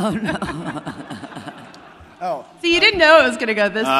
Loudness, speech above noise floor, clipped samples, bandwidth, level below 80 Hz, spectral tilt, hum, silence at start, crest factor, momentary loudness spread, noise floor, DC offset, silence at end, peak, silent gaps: -16 LUFS; 25 dB; under 0.1%; 14 kHz; -48 dBFS; -4 dB/octave; none; 0 s; 18 dB; 22 LU; -42 dBFS; under 0.1%; 0 s; 0 dBFS; none